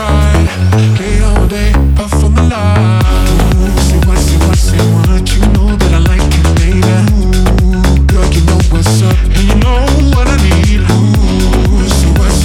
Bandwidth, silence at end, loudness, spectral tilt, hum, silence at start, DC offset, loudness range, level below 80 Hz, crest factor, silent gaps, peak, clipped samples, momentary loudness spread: 15.5 kHz; 0 s; -10 LUFS; -6 dB/octave; none; 0 s; under 0.1%; 1 LU; -10 dBFS; 8 dB; none; 0 dBFS; under 0.1%; 2 LU